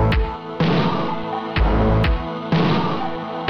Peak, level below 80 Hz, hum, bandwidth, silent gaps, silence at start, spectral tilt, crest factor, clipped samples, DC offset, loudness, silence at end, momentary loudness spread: -6 dBFS; -26 dBFS; none; 6.4 kHz; none; 0 s; -8 dB/octave; 12 dB; under 0.1%; under 0.1%; -20 LUFS; 0 s; 7 LU